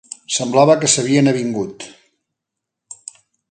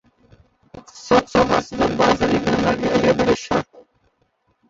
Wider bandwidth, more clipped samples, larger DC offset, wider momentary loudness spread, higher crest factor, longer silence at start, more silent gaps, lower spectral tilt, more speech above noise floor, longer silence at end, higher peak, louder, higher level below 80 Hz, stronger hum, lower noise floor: first, 9.6 kHz vs 7.8 kHz; neither; neither; first, 23 LU vs 7 LU; about the same, 18 dB vs 18 dB; second, 0.3 s vs 0.75 s; neither; second, -4 dB/octave vs -5.5 dB/octave; first, 66 dB vs 48 dB; second, 0.55 s vs 0.9 s; about the same, 0 dBFS vs -2 dBFS; first, -15 LUFS vs -18 LUFS; second, -62 dBFS vs -44 dBFS; neither; first, -81 dBFS vs -66 dBFS